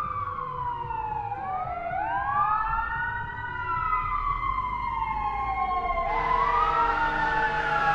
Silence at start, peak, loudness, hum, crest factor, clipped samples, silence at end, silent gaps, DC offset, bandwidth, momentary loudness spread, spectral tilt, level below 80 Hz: 0 s; -12 dBFS; -27 LUFS; none; 14 dB; under 0.1%; 0 s; none; under 0.1%; 8.4 kHz; 8 LU; -6 dB/octave; -40 dBFS